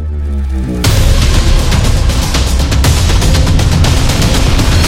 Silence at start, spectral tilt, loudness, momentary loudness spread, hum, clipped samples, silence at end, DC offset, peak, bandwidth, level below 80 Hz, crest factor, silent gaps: 0 s; -4.5 dB/octave; -11 LUFS; 5 LU; none; under 0.1%; 0 s; under 0.1%; 0 dBFS; 16.5 kHz; -12 dBFS; 8 dB; none